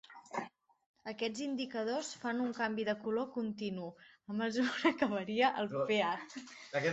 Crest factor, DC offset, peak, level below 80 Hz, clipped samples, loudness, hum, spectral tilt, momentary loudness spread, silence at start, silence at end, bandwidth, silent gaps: 20 dB; under 0.1%; -16 dBFS; -78 dBFS; under 0.1%; -36 LUFS; none; -4.5 dB/octave; 14 LU; 0.1 s; 0 s; 8.2 kHz; 0.86-0.94 s